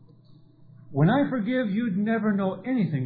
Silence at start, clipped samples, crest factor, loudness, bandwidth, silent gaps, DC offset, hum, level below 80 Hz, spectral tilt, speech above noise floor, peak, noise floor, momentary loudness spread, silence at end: 0.3 s; under 0.1%; 16 dB; -25 LUFS; 4.7 kHz; none; under 0.1%; none; -66 dBFS; -11.5 dB/octave; 29 dB; -10 dBFS; -53 dBFS; 5 LU; 0 s